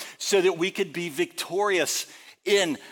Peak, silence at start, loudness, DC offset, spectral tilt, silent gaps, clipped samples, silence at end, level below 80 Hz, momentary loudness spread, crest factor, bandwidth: -10 dBFS; 0 s; -25 LUFS; under 0.1%; -2.5 dB/octave; none; under 0.1%; 0 s; -78 dBFS; 7 LU; 16 dB; 17.5 kHz